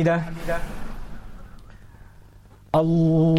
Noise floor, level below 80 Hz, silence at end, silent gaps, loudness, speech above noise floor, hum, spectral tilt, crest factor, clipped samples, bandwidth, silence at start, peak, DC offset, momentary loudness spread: -48 dBFS; -38 dBFS; 0 s; none; -23 LUFS; 28 dB; none; -8.5 dB/octave; 14 dB; under 0.1%; 12 kHz; 0 s; -10 dBFS; under 0.1%; 25 LU